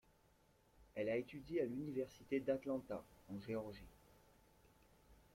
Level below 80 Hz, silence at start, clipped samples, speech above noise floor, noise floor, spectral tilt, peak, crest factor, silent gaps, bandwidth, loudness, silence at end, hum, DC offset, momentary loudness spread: -72 dBFS; 0.8 s; under 0.1%; 30 dB; -74 dBFS; -7 dB/octave; -26 dBFS; 20 dB; none; 16.5 kHz; -45 LUFS; 0.2 s; none; under 0.1%; 13 LU